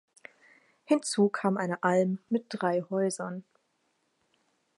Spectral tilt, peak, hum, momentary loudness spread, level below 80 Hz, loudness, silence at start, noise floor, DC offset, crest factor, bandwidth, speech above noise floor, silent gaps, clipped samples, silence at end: -5.5 dB/octave; -12 dBFS; none; 8 LU; -84 dBFS; -29 LUFS; 0.9 s; -75 dBFS; under 0.1%; 20 dB; 11.5 kHz; 47 dB; none; under 0.1%; 1.35 s